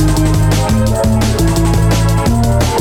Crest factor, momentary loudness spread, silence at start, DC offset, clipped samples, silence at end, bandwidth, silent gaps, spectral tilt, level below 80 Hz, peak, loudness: 8 dB; 1 LU; 0 s; under 0.1%; under 0.1%; 0 s; 17 kHz; none; -6 dB/octave; -18 dBFS; -4 dBFS; -12 LUFS